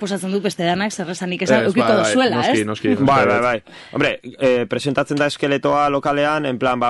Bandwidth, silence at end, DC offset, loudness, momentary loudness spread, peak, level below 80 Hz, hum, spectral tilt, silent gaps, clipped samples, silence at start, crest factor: 11.5 kHz; 0 s; under 0.1%; -18 LUFS; 7 LU; -2 dBFS; -54 dBFS; none; -5 dB/octave; none; under 0.1%; 0 s; 16 dB